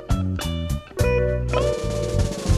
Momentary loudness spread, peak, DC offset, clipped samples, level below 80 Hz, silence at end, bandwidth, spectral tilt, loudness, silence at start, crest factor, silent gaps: 5 LU; -6 dBFS; under 0.1%; under 0.1%; -28 dBFS; 0 s; 14 kHz; -6 dB/octave; -24 LUFS; 0 s; 16 dB; none